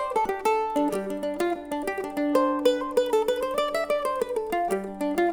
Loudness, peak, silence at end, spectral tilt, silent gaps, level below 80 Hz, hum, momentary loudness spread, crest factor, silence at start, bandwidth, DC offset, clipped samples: -26 LUFS; -8 dBFS; 0 s; -4.5 dB/octave; none; -56 dBFS; none; 6 LU; 18 dB; 0 s; over 20 kHz; under 0.1%; under 0.1%